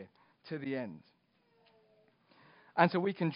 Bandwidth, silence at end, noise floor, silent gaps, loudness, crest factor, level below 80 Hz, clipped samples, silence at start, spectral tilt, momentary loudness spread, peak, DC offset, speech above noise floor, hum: 5.2 kHz; 0 s; -72 dBFS; none; -34 LUFS; 26 dB; -82 dBFS; under 0.1%; 0 s; -5 dB/octave; 22 LU; -10 dBFS; under 0.1%; 40 dB; none